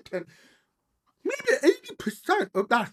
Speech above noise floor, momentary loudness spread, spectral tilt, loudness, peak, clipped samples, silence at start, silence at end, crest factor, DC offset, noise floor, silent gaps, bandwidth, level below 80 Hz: 48 dB; 13 LU; -4 dB/octave; -27 LUFS; -8 dBFS; under 0.1%; 0.1 s; 0.05 s; 20 dB; under 0.1%; -74 dBFS; none; 14.5 kHz; -70 dBFS